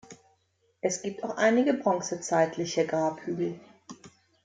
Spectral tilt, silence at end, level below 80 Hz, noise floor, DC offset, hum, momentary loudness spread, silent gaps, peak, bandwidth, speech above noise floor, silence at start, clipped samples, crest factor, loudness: -4.5 dB/octave; 0.35 s; -72 dBFS; -71 dBFS; under 0.1%; none; 18 LU; none; -10 dBFS; 9.4 kHz; 44 dB; 0.1 s; under 0.1%; 18 dB; -28 LUFS